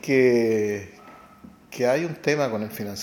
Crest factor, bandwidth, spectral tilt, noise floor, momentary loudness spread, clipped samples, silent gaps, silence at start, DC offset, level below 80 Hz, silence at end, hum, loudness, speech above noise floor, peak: 18 dB; 17.5 kHz; -5.5 dB/octave; -48 dBFS; 14 LU; under 0.1%; none; 0.05 s; under 0.1%; -64 dBFS; 0 s; none; -23 LUFS; 26 dB; -6 dBFS